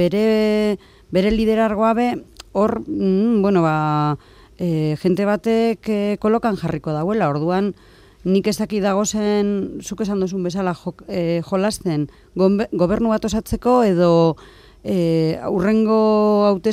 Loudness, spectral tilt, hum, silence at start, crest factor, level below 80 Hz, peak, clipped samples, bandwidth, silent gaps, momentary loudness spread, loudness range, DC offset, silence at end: -19 LUFS; -6.5 dB/octave; none; 0 s; 14 dB; -44 dBFS; -4 dBFS; under 0.1%; 15 kHz; none; 9 LU; 3 LU; under 0.1%; 0 s